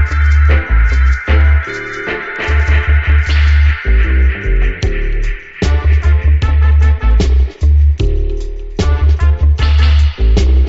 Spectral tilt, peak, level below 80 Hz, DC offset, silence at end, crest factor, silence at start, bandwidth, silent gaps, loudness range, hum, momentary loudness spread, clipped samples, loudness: -5.5 dB/octave; 0 dBFS; -10 dBFS; under 0.1%; 0 s; 10 dB; 0 s; 7.2 kHz; none; 1 LU; none; 9 LU; under 0.1%; -13 LUFS